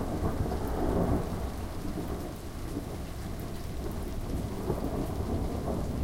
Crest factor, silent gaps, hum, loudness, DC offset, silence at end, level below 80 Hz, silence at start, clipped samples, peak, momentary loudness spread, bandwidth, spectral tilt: 18 dB; none; none; -34 LUFS; under 0.1%; 0 s; -38 dBFS; 0 s; under 0.1%; -14 dBFS; 8 LU; 17 kHz; -7 dB/octave